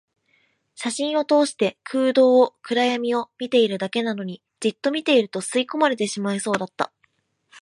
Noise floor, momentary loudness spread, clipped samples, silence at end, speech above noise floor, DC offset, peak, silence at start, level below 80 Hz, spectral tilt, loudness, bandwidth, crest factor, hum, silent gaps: -67 dBFS; 10 LU; under 0.1%; 0.05 s; 46 dB; under 0.1%; -4 dBFS; 0.8 s; -74 dBFS; -4 dB/octave; -22 LUFS; 11.5 kHz; 18 dB; none; none